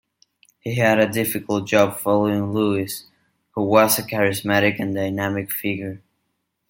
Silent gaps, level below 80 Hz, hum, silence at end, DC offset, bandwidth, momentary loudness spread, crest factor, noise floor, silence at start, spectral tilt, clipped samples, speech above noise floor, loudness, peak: none; -62 dBFS; none; 0.7 s; under 0.1%; 17 kHz; 12 LU; 20 dB; -74 dBFS; 0.65 s; -5 dB/octave; under 0.1%; 54 dB; -20 LUFS; -2 dBFS